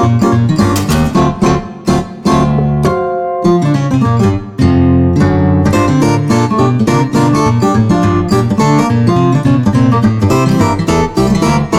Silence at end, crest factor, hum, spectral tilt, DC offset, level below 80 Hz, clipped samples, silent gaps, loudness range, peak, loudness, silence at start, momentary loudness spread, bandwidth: 0 s; 10 dB; none; -7 dB/octave; under 0.1%; -28 dBFS; under 0.1%; none; 2 LU; 0 dBFS; -11 LUFS; 0 s; 3 LU; 15.5 kHz